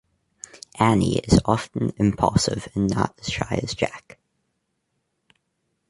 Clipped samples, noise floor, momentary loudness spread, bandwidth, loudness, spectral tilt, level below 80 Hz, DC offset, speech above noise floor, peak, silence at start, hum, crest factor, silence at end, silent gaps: under 0.1%; -75 dBFS; 20 LU; 11.5 kHz; -22 LUFS; -5.5 dB/octave; -40 dBFS; under 0.1%; 53 dB; -2 dBFS; 0.55 s; none; 22 dB; 1.9 s; none